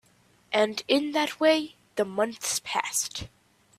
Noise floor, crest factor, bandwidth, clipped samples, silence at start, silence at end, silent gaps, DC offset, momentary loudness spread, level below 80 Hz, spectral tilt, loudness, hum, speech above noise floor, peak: -62 dBFS; 20 dB; 15.5 kHz; under 0.1%; 0.5 s; 0.5 s; none; under 0.1%; 10 LU; -62 dBFS; -2 dB/octave; -27 LUFS; none; 36 dB; -8 dBFS